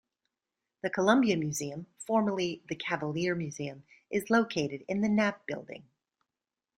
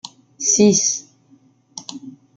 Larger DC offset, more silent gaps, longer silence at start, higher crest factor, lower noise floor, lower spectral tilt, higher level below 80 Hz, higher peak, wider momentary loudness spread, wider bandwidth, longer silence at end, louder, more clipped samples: neither; neither; first, 0.85 s vs 0.05 s; about the same, 22 dB vs 18 dB; first, under -90 dBFS vs -54 dBFS; first, -5 dB/octave vs -3.5 dB/octave; second, -70 dBFS vs -64 dBFS; second, -10 dBFS vs -2 dBFS; second, 14 LU vs 25 LU; first, 15 kHz vs 10 kHz; first, 0.95 s vs 0.25 s; second, -31 LUFS vs -16 LUFS; neither